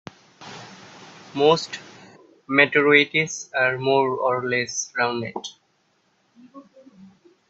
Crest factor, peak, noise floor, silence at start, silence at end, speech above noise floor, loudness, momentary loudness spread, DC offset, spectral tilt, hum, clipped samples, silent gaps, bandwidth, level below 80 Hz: 24 dB; 0 dBFS; -66 dBFS; 0.4 s; 0.45 s; 45 dB; -20 LUFS; 23 LU; under 0.1%; -3.5 dB/octave; none; under 0.1%; none; 8 kHz; -68 dBFS